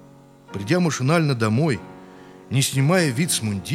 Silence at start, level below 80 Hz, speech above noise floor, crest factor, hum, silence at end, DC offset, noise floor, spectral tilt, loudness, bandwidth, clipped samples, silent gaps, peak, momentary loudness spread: 0.5 s; -60 dBFS; 27 dB; 18 dB; none; 0 s; under 0.1%; -48 dBFS; -5 dB/octave; -21 LUFS; 16 kHz; under 0.1%; none; -4 dBFS; 11 LU